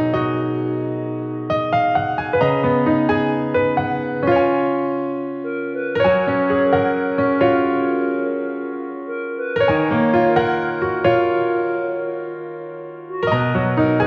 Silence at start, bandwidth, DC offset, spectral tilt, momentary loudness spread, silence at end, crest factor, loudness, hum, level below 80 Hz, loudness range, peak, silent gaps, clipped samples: 0 s; 6.2 kHz; under 0.1%; -9 dB/octave; 10 LU; 0 s; 16 dB; -19 LUFS; none; -50 dBFS; 1 LU; -4 dBFS; none; under 0.1%